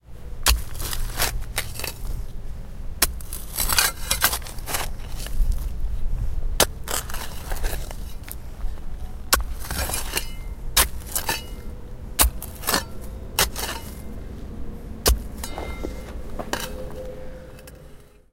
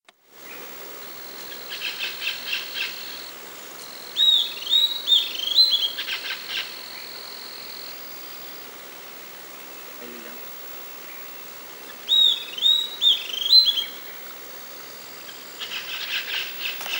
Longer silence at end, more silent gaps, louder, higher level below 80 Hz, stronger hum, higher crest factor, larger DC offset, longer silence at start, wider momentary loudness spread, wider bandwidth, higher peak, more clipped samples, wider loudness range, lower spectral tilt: first, 0.25 s vs 0 s; neither; second, -25 LUFS vs -20 LUFS; first, -30 dBFS vs -76 dBFS; neither; about the same, 26 dB vs 22 dB; neither; second, 0.05 s vs 0.3 s; second, 17 LU vs 20 LU; about the same, 17 kHz vs 16.5 kHz; first, 0 dBFS vs -4 dBFS; neither; second, 5 LU vs 17 LU; first, -2 dB/octave vs 1 dB/octave